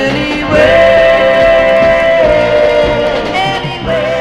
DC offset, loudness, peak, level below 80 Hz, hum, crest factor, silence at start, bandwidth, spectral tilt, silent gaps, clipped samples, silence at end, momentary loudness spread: under 0.1%; -9 LUFS; 0 dBFS; -30 dBFS; none; 8 dB; 0 s; 11 kHz; -5.5 dB/octave; none; 0.2%; 0 s; 8 LU